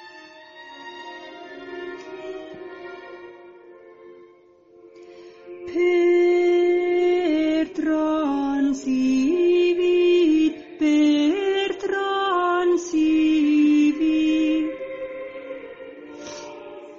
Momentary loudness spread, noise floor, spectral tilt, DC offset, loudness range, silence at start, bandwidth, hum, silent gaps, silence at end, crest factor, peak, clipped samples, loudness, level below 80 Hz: 21 LU; -53 dBFS; -2 dB/octave; under 0.1%; 18 LU; 0 s; 7.6 kHz; none; none; 0 s; 12 dB; -10 dBFS; under 0.1%; -20 LUFS; -58 dBFS